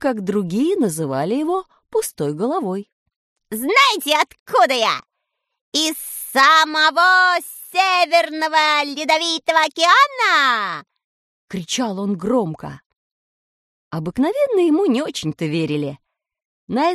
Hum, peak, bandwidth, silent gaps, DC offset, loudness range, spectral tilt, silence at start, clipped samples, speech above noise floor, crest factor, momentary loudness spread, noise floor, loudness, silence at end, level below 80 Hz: none; -2 dBFS; 13 kHz; 2.92-3.06 s, 3.16-3.36 s, 4.40-4.46 s, 5.61-5.72 s, 11.04-11.48 s, 12.86-12.90 s, 12.96-13.91 s, 16.45-16.67 s; under 0.1%; 7 LU; -3.5 dB/octave; 0 s; under 0.1%; 59 dB; 18 dB; 13 LU; -77 dBFS; -17 LUFS; 0 s; -60 dBFS